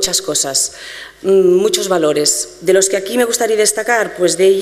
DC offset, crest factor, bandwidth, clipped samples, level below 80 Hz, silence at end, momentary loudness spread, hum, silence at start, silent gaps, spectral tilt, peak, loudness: under 0.1%; 14 dB; 15.5 kHz; under 0.1%; -52 dBFS; 0 s; 5 LU; none; 0 s; none; -2.5 dB/octave; 0 dBFS; -14 LUFS